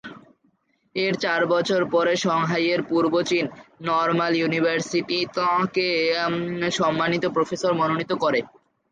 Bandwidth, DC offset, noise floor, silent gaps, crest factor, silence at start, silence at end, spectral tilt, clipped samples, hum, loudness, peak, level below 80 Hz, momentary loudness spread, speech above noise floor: 9.4 kHz; under 0.1%; -66 dBFS; none; 14 dB; 0.05 s; 0.45 s; -5 dB/octave; under 0.1%; none; -22 LUFS; -10 dBFS; -66 dBFS; 4 LU; 44 dB